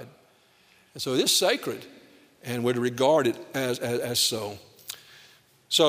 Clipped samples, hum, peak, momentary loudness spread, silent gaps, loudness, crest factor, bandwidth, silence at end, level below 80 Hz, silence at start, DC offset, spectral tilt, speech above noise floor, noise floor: under 0.1%; none; -8 dBFS; 19 LU; none; -25 LUFS; 20 dB; 16 kHz; 0 s; -70 dBFS; 0 s; under 0.1%; -3 dB/octave; 35 dB; -60 dBFS